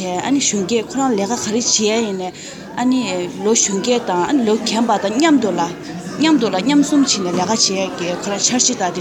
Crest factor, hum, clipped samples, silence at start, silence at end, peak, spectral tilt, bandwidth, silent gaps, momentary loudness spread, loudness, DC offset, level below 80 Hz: 16 dB; none; under 0.1%; 0 s; 0 s; -2 dBFS; -3 dB/octave; 14.5 kHz; none; 8 LU; -16 LUFS; under 0.1%; -56 dBFS